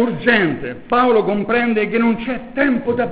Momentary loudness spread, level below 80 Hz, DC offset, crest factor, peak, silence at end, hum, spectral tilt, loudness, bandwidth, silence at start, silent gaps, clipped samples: 7 LU; -48 dBFS; 1%; 16 dB; -2 dBFS; 0 s; none; -9.5 dB/octave; -17 LUFS; 4 kHz; 0 s; none; under 0.1%